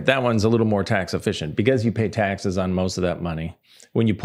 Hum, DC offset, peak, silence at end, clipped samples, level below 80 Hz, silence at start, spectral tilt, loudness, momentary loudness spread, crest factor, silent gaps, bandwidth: none; under 0.1%; -2 dBFS; 0 s; under 0.1%; -52 dBFS; 0 s; -6.5 dB/octave; -22 LUFS; 8 LU; 20 dB; none; 13 kHz